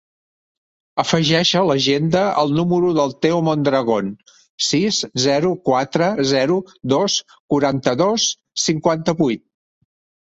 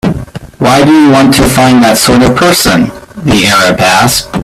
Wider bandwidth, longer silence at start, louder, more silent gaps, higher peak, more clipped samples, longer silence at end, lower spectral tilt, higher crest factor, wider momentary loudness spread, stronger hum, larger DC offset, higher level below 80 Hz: second, 8.2 kHz vs 16.5 kHz; first, 0.95 s vs 0.05 s; second, -18 LUFS vs -6 LUFS; first, 4.49-4.58 s, 7.40-7.49 s vs none; about the same, -2 dBFS vs 0 dBFS; second, under 0.1% vs 0.5%; first, 0.9 s vs 0 s; about the same, -4.5 dB/octave vs -4 dB/octave; first, 16 dB vs 6 dB; second, 6 LU vs 10 LU; neither; neither; second, -56 dBFS vs -28 dBFS